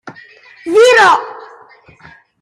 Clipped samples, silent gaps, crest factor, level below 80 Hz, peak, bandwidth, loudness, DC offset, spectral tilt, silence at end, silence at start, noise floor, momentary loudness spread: under 0.1%; none; 14 dB; -60 dBFS; 0 dBFS; 14.5 kHz; -9 LUFS; under 0.1%; -2 dB/octave; 1 s; 0.05 s; -43 dBFS; 23 LU